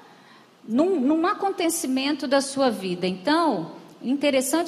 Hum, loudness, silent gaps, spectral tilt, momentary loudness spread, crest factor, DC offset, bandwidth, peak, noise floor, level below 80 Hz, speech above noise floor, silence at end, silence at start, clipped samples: none; -23 LUFS; none; -4 dB/octave; 7 LU; 16 dB; under 0.1%; 15 kHz; -8 dBFS; -52 dBFS; -74 dBFS; 29 dB; 0 s; 0.65 s; under 0.1%